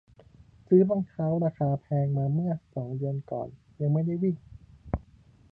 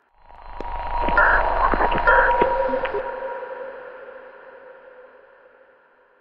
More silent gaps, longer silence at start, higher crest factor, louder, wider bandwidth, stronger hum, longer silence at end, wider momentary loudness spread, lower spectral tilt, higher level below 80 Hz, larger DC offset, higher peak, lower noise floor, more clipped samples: neither; first, 0.7 s vs 0 s; about the same, 20 dB vs 20 dB; second, -28 LUFS vs -20 LUFS; second, 2.5 kHz vs 5.4 kHz; neither; first, 0.55 s vs 0 s; second, 14 LU vs 23 LU; first, -13 dB/octave vs -7.5 dB/octave; second, -50 dBFS vs -32 dBFS; neither; second, -8 dBFS vs -4 dBFS; about the same, -56 dBFS vs -56 dBFS; neither